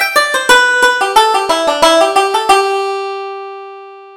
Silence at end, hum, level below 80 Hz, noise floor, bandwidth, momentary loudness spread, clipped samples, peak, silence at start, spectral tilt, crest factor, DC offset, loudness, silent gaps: 0 s; none; -48 dBFS; -32 dBFS; 20 kHz; 17 LU; 0.1%; 0 dBFS; 0 s; -0.5 dB/octave; 12 dB; under 0.1%; -10 LUFS; none